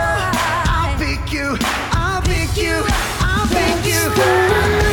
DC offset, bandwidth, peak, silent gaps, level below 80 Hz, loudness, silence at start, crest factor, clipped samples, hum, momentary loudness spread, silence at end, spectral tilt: under 0.1%; over 20 kHz; -2 dBFS; none; -24 dBFS; -17 LUFS; 0 s; 14 dB; under 0.1%; none; 5 LU; 0 s; -4.5 dB/octave